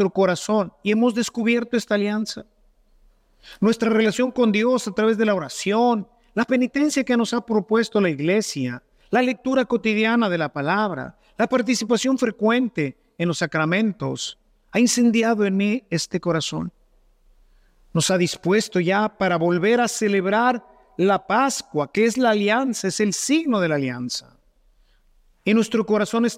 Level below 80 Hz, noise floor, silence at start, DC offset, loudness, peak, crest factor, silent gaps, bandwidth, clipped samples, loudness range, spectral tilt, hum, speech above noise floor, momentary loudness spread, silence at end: -60 dBFS; -58 dBFS; 0 s; under 0.1%; -21 LUFS; -6 dBFS; 16 dB; none; 15.5 kHz; under 0.1%; 3 LU; -4.5 dB/octave; none; 38 dB; 8 LU; 0 s